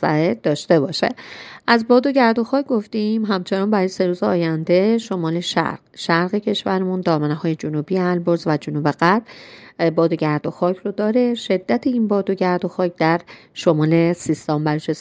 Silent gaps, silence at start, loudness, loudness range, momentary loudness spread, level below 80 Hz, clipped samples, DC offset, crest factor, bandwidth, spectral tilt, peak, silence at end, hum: none; 0 s; -19 LUFS; 2 LU; 6 LU; -64 dBFS; under 0.1%; under 0.1%; 18 dB; 9.6 kHz; -6.5 dB/octave; 0 dBFS; 0 s; none